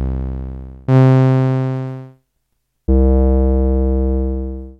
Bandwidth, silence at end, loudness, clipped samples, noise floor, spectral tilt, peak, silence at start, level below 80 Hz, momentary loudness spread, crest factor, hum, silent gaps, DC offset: 5 kHz; 0.05 s; -16 LUFS; under 0.1%; -69 dBFS; -10.5 dB/octave; -4 dBFS; 0 s; -20 dBFS; 17 LU; 12 dB; none; none; under 0.1%